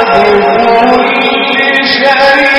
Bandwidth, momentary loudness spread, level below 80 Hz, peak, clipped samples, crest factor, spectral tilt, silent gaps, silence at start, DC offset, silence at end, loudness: 13 kHz; 3 LU; -40 dBFS; 0 dBFS; 2%; 6 dB; -4.5 dB/octave; none; 0 s; under 0.1%; 0 s; -7 LUFS